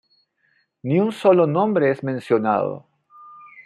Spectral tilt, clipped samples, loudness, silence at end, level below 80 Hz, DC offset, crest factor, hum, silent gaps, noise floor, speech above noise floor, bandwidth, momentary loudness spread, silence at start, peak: -8.5 dB/octave; under 0.1%; -20 LUFS; 0.05 s; -70 dBFS; under 0.1%; 18 dB; none; none; -66 dBFS; 47 dB; 11.5 kHz; 11 LU; 0.85 s; -2 dBFS